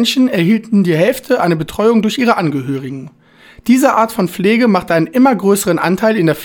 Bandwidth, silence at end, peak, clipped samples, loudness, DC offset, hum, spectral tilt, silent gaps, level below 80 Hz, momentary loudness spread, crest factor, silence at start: 19.5 kHz; 0 s; 0 dBFS; under 0.1%; -13 LUFS; under 0.1%; none; -5.5 dB/octave; none; -50 dBFS; 7 LU; 12 dB; 0 s